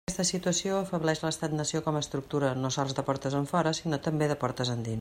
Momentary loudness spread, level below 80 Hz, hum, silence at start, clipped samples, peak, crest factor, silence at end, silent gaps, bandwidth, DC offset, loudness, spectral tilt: 3 LU; -58 dBFS; none; 0.1 s; under 0.1%; -12 dBFS; 18 dB; 0 s; none; 16 kHz; under 0.1%; -30 LUFS; -4.5 dB/octave